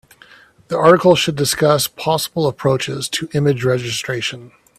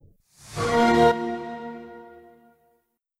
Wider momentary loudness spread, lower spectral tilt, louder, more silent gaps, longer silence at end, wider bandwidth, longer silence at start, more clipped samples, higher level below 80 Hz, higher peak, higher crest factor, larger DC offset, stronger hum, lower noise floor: second, 10 LU vs 24 LU; about the same, -4.5 dB/octave vs -5.5 dB/octave; first, -16 LUFS vs -22 LUFS; neither; second, 0.3 s vs 1.05 s; about the same, 16 kHz vs 15 kHz; first, 0.7 s vs 0.45 s; neither; about the same, -52 dBFS vs -52 dBFS; first, 0 dBFS vs -8 dBFS; about the same, 18 dB vs 18 dB; neither; neither; second, -46 dBFS vs -70 dBFS